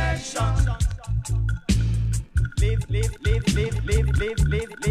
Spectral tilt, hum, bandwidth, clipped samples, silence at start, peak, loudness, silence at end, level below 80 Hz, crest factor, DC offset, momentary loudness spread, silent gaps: -5.5 dB/octave; none; 14 kHz; under 0.1%; 0 s; -8 dBFS; -24 LUFS; 0 s; -26 dBFS; 14 dB; under 0.1%; 4 LU; none